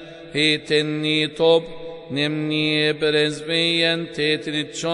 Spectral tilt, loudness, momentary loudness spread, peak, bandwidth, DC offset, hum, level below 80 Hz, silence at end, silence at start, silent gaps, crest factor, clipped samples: -4.5 dB/octave; -20 LUFS; 7 LU; -4 dBFS; 11 kHz; under 0.1%; none; -58 dBFS; 0 s; 0 s; none; 16 dB; under 0.1%